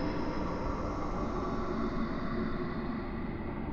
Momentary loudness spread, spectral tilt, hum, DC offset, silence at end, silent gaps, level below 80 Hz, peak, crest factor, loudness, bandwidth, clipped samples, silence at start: 3 LU; -8 dB/octave; none; under 0.1%; 0 s; none; -40 dBFS; -20 dBFS; 14 dB; -36 LUFS; 7.2 kHz; under 0.1%; 0 s